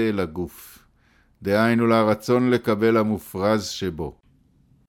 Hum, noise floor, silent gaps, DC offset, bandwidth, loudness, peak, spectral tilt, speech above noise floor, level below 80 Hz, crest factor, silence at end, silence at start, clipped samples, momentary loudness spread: none; -60 dBFS; none; under 0.1%; 17 kHz; -22 LUFS; -8 dBFS; -6 dB/octave; 38 dB; -52 dBFS; 16 dB; 0.8 s; 0 s; under 0.1%; 14 LU